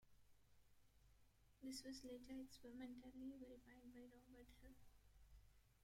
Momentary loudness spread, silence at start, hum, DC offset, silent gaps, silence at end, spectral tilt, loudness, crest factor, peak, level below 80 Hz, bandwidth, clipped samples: 12 LU; 0 s; 50 Hz at -75 dBFS; under 0.1%; none; 0 s; -4 dB/octave; -59 LUFS; 18 dB; -42 dBFS; -74 dBFS; 16 kHz; under 0.1%